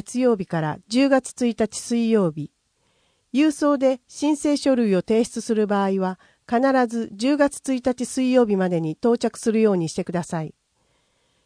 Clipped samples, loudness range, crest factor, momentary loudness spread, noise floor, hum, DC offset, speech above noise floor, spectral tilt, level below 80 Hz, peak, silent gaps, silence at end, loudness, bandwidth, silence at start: under 0.1%; 2 LU; 18 dB; 8 LU; -67 dBFS; none; under 0.1%; 46 dB; -5.5 dB/octave; -60 dBFS; -4 dBFS; none; 1 s; -22 LUFS; 10.5 kHz; 0.1 s